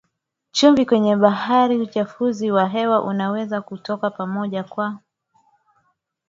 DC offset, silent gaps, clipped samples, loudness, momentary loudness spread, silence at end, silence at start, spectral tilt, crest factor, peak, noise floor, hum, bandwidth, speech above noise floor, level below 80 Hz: under 0.1%; none; under 0.1%; -20 LUFS; 11 LU; 1.35 s; 0.55 s; -5.5 dB/octave; 20 dB; 0 dBFS; -75 dBFS; none; 7.8 kHz; 56 dB; -64 dBFS